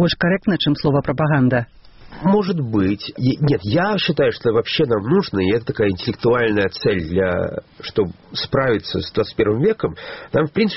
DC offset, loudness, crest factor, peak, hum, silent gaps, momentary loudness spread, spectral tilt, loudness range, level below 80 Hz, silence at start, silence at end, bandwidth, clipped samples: 0.2%; -19 LUFS; 16 dB; -4 dBFS; none; none; 6 LU; -5 dB/octave; 2 LU; -44 dBFS; 0 s; 0 s; 6 kHz; under 0.1%